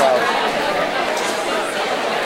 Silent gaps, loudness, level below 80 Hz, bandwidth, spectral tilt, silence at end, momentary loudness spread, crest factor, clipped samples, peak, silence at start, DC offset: none; -19 LUFS; -54 dBFS; 16.5 kHz; -2.5 dB/octave; 0 s; 4 LU; 16 dB; under 0.1%; -2 dBFS; 0 s; under 0.1%